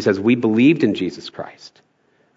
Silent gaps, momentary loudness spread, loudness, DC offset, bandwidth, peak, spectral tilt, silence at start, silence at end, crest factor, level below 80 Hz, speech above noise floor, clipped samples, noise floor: none; 19 LU; -17 LUFS; under 0.1%; 7.8 kHz; -2 dBFS; -7 dB/octave; 0 s; 0.7 s; 16 dB; -68 dBFS; 43 dB; under 0.1%; -61 dBFS